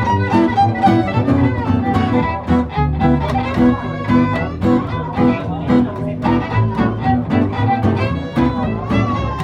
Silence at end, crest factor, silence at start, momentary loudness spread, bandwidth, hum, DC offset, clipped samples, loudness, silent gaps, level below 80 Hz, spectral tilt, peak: 0 s; 14 dB; 0 s; 4 LU; 8 kHz; none; under 0.1%; under 0.1%; -16 LUFS; none; -30 dBFS; -8.5 dB/octave; -2 dBFS